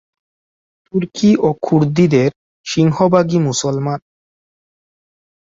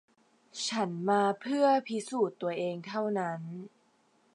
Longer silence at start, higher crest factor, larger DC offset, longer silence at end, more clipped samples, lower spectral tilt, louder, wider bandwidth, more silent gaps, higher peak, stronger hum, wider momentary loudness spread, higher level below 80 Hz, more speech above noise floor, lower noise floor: first, 0.95 s vs 0.55 s; about the same, 16 dB vs 18 dB; neither; first, 1.45 s vs 0.7 s; neither; first, -6.5 dB/octave vs -5 dB/octave; first, -15 LUFS vs -31 LUFS; second, 7.8 kHz vs 11 kHz; first, 2.36-2.64 s vs none; first, -2 dBFS vs -14 dBFS; neither; second, 10 LU vs 16 LU; first, -52 dBFS vs -86 dBFS; first, over 76 dB vs 38 dB; first, under -90 dBFS vs -69 dBFS